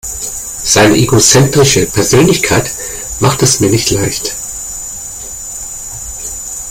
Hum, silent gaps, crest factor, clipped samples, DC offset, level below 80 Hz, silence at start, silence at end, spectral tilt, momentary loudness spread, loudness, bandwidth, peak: none; none; 12 dB; under 0.1%; under 0.1%; -32 dBFS; 0.05 s; 0 s; -3.5 dB/octave; 14 LU; -11 LUFS; over 20 kHz; 0 dBFS